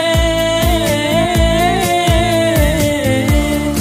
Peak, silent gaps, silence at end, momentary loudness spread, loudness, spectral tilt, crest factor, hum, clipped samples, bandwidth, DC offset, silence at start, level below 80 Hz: 0 dBFS; none; 0 s; 2 LU; -13 LUFS; -5 dB/octave; 12 dB; none; under 0.1%; 16 kHz; under 0.1%; 0 s; -20 dBFS